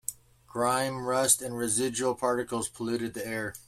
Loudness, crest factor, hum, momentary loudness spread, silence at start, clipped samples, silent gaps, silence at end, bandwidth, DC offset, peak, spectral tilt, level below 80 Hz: -28 LUFS; 22 dB; none; 10 LU; 0.1 s; under 0.1%; none; 0.05 s; 16 kHz; under 0.1%; -8 dBFS; -3 dB/octave; -62 dBFS